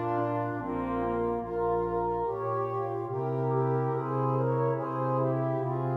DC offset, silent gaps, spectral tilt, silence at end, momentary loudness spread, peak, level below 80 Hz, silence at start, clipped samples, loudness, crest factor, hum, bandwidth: under 0.1%; none; -11 dB/octave; 0 s; 4 LU; -16 dBFS; -54 dBFS; 0 s; under 0.1%; -30 LUFS; 12 dB; none; 4.1 kHz